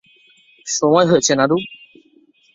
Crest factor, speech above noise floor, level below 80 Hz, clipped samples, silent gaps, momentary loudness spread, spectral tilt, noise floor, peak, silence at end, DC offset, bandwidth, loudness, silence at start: 18 dB; 39 dB; -60 dBFS; under 0.1%; none; 17 LU; -4 dB/octave; -54 dBFS; -2 dBFS; 0.8 s; under 0.1%; 7.8 kHz; -16 LUFS; 0.65 s